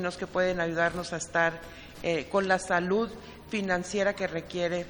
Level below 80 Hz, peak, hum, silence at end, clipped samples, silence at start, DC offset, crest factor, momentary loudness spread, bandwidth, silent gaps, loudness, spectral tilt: -54 dBFS; -10 dBFS; none; 0 s; under 0.1%; 0 s; under 0.1%; 20 dB; 9 LU; over 20 kHz; none; -29 LUFS; -4.5 dB/octave